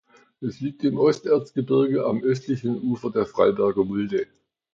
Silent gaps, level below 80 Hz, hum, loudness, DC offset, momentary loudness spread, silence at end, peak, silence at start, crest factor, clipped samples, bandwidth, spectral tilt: none; -60 dBFS; none; -23 LUFS; under 0.1%; 10 LU; 0.5 s; -6 dBFS; 0.4 s; 18 dB; under 0.1%; 7.6 kHz; -8 dB/octave